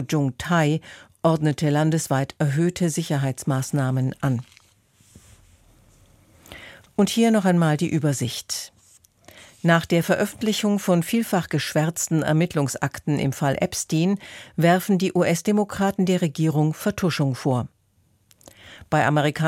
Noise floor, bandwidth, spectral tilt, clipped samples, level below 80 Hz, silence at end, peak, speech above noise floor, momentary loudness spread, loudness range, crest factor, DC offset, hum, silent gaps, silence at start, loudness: -63 dBFS; 16.5 kHz; -5.5 dB/octave; under 0.1%; -56 dBFS; 0 s; -4 dBFS; 42 dB; 7 LU; 5 LU; 18 dB; under 0.1%; none; none; 0 s; -22 LUFS